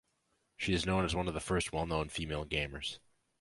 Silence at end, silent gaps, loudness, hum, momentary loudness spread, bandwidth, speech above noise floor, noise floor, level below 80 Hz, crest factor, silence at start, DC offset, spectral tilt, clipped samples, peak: 0.45 s; none; -35 LUFS; none; 8 LU; 11.5 kHz; 43 dB; -78 dBFS; -48 dBFS; 20 dB; 0.6 s; under 0.1%; -4.5 dB/octave; under 0.1%; -18 dBFS